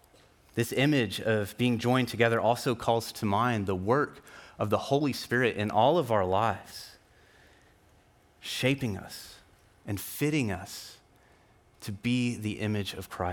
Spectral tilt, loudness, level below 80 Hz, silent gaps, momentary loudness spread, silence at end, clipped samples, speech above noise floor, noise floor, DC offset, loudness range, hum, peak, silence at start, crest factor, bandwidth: -5.5 dB/octave; -29 LUFS; -64 dBFS; none; 18 LU; 0 s; under 0.1%; 33 dB; -62 dBFS; under 0.1%; 8 LU; none; -10 dBFS; 0.55 s; 20 dB; 19 kHz